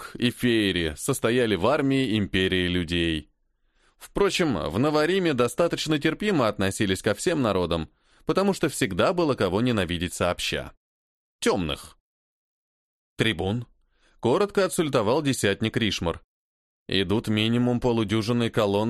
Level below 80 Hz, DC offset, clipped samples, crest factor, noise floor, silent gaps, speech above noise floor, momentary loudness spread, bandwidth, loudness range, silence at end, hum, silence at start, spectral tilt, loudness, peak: -48 dBFS; under 0.1%; under 0.1%; 18 dB; -68 dBFS; 10.77-11.39 s, 12.00-13.16 s, 16.24-16.86 s; 44 dB; 6 LU; 13 kHz; 5 LU; 0 s; none; 0 s; -5 dB/octave; -24 LUFS; -6 dBFS